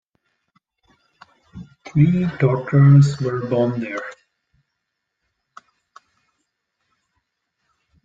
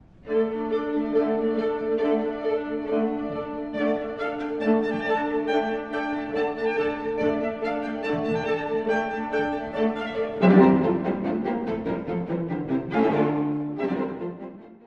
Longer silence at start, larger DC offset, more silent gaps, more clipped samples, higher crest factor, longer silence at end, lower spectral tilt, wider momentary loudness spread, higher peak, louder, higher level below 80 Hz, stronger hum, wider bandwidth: first, 1.55 s vs 0.25 s; neither; neither; neither; about the same, 18 dB vs 20 dB; first, 3.9 s vs 0.1 s; about the same, -9 dB/octave vs -8.5 dB/octave; first, 25 LU vs 7 LU; about the same, -4 dBFS vs -6 dBFS; first, -17 LUFS vs -25 LUFS; about the same, -54 dBFS vs -54 dBFS; neither; first, 7.6 kHz vs 6.8 kHz